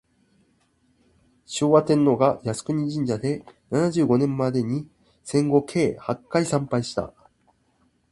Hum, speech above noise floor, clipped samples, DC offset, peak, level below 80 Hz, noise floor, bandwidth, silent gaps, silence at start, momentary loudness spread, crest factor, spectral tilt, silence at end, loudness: none; 43 dB; under 0.1%; under 0.1%; -4 dBFS; -58 dBFS; -65 dBFS; 11.5 kHz; none; 1.5 s; 12 LU; 20 dB; -6.5 dB/octave; 1 s; -23 LUFS